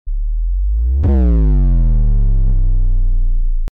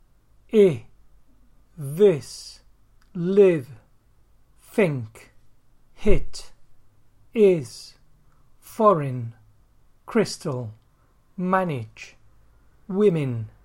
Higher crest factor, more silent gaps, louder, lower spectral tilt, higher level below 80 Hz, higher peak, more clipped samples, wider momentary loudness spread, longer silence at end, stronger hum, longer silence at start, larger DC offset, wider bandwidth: second, 4 dB vs 22 dB; neither; first, -17 LUFS vs -22 LUFS; first, -11.5 dB/octave vs -7 dB/octave; first, -12 dBFS vs -38 dBFS; second, -8 dBFS vs -2 dBFS; neither; second, 8 LU vs 22 LU; about the same, 0.05 s vs 0.15 s; neither; second, 0.05 s vs 0.55 s; neither; second, 1.8 kHz vs 16 kHz